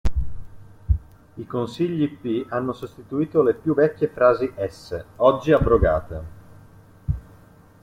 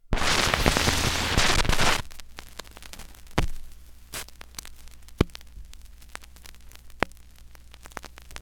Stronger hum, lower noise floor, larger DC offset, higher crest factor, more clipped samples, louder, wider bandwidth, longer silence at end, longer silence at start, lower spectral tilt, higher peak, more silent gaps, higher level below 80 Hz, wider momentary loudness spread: neither; about the same, -50 dBFS vs -48 dBFS; second, under 0.1% vs 0.3%; second, 20 dB vs 26 dB; neither; first, -22 LUFS vs -25 LUFS; second, 13 kHz vs 18 kHz; first, 0.65 s vs 0.05 s; about the same, 0.05 s vs 0.1 s; first, -8.5 dB/octave vs -3 dB/octave; second, -4 dBFS vs 0 dBFS; neither; about the same, -34 dBFS vs -34 dBFS; second, 16 LU vs 24 LU